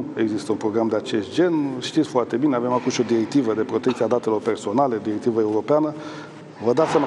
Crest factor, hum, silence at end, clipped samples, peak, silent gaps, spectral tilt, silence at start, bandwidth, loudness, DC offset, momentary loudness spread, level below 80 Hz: 16 dB; none; 0 s; under 0.1%; -6 dBFS; none; -6 dB/octave; 0 s; 11.5 kHz; -22 LUFS; under 0.1%; 4 LU; -72 dBFS